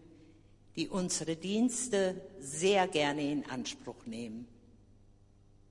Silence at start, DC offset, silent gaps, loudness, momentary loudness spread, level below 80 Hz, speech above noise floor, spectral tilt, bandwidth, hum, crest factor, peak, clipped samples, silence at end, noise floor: 0.75 s; under 0.1%; none; -33 LUFS; 16 LU; -64 dBFS; 28 dB; -3.5 dB/octave; 11.5 kHz; none; 20 dB; -16 dBFS; under 0.1%; 1.2 s; -62 dBFS